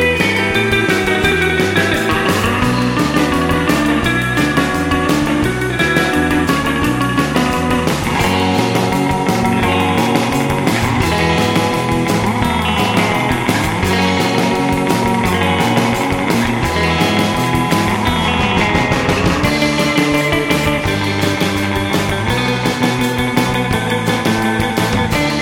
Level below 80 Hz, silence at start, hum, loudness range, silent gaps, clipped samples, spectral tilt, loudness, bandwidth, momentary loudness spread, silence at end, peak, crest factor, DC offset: -32 dBFS; 0 s; none; 1 LU; none; under 0.1%; -5 dB/octave; -14 LUFS; 17 kHz; 2 LU; 0 s; 0 dBFS; 14 dB; under 0.1%